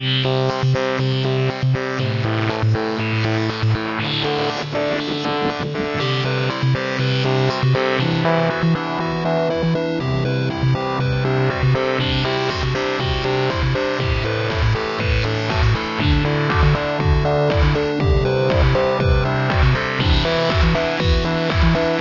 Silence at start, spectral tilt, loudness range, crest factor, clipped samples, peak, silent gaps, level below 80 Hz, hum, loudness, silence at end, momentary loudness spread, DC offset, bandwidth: 0 s; -6.5 dB/octave; 3 LU; 16 dB; under 0.1%; -2 dBFS; none; -28 dBFS; none; -19 LUFS; 0 s; 4 LU; under 0.1%; 6 kHz